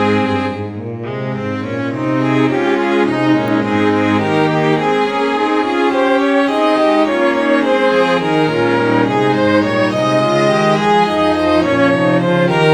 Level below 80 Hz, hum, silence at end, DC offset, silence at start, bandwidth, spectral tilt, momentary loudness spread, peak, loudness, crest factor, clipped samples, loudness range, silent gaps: -50 dBFS; none; 0 s; under 0.1%; 0 s; 11 kHz; -6.5 dB/octave; 7 LU; 0 dBFS; -14 LUFS; 14 dB; under 0.1%; 3 LU; none